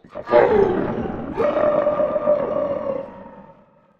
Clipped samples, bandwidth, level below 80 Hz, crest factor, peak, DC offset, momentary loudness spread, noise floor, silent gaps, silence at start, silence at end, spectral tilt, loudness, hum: under 0.1%; 5.8 kHz; -46 dBFS; 20 dB; 0 dBFS; under 0.1%; 12 LU; -51 dBFS; none; 0.15 s; 0.55 s; -8.5 dB/octave; -20 LUFS; none